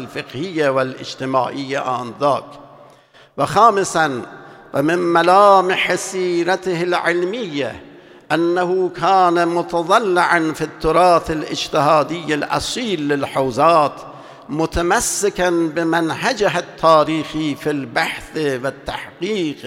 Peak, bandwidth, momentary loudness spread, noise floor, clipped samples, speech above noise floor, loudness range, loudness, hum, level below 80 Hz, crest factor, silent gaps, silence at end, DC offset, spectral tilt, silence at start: 0 dBFS; 16.5 kHz; 11 LU; -48 dBFS; under 0.1%; 30 dB; 4 LU; -17 LUFS; none; -44 dBFS; 18 dB; none; 0 s; under 0.1%; -4 dB/octave; 0 s